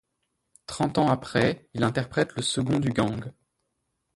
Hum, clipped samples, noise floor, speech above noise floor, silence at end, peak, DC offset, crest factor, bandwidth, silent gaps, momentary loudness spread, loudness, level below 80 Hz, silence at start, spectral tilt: none; under 0.1%; -78 dBFS; 52 dB; 0.85 s; -8 dBFS; under 0.1%; 20 dB; 11.5 kHz; none; 13 LU; -26 LUFS; -56 dBFS; 0.7 s; -5.5 dB/octave